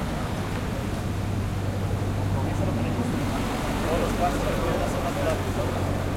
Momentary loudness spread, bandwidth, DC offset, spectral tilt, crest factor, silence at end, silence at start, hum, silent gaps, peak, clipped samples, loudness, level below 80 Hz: 4 LU; 16.5 kHz; under 0.1%; -6 dB/octave; 14 dB; 0 s; 0 s; none; none; -12 dBFS; under 0.1%; -27 LUFS; -34 dBFS